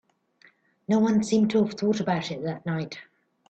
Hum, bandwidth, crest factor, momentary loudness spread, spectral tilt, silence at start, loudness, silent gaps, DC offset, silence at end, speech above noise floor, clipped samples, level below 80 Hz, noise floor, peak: none; 8.8 kHz; 14 dB; 13 LU; -6.5 dB/octave; 0.9 s; -25 LUFS; none; under 0.1%; 0.45 s; 36 dB; under 0.1%; -68 dBFS; -60 dBFS; -12 dBFS